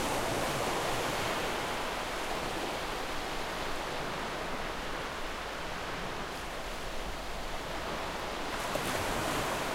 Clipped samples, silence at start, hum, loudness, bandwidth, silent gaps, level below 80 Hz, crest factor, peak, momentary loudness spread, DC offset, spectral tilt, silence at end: under 0.1%; 0 s; none; -35 LUFS; 16 kHz; none; -46 dBFS; 16 dB; -18 dBFS; 7 LU; under 0.1%; -3 dB/octave; 0 s